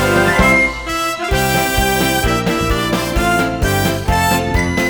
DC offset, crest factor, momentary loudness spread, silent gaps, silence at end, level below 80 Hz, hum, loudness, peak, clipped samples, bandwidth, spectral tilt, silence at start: under 0.1%; 14 dB; 5 LU; none; 0 s; -24 dBFS; none; -15 LUFS; 0 dBFS; under 0.1%; over 20 kHz; -4.5 dB/octave; 0 s